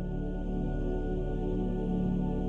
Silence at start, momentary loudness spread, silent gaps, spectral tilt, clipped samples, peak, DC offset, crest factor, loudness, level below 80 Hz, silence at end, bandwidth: 0 s; 4 LU; none; -10 dB/octave; under 0.1%; -20 dBFS; under 0.1%; 12 dB; -33 LUFS; -36 dBFS; 0 s; 3.7 kHz